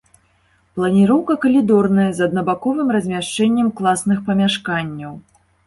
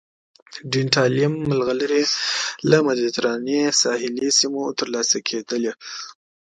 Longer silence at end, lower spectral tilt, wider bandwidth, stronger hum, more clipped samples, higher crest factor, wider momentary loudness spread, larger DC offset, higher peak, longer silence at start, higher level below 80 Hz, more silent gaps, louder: about the same, 0.45 s vs 0.4 s; first, -6 dB/octave vs -3.5 dB/octave; about the same, 11.5 kHz vs 11 kHz; neither; neither; second, 14 dB vs 20 dB; about the same, 9 LU vs 11 LU; neither; about the same, -4 dBFS vs -2 dBFS; first, 0.75 s vs 0.5 s; first, -54 dBFS vs -62 dBFS; neither; first, -17 LUFS vs -20 LUFS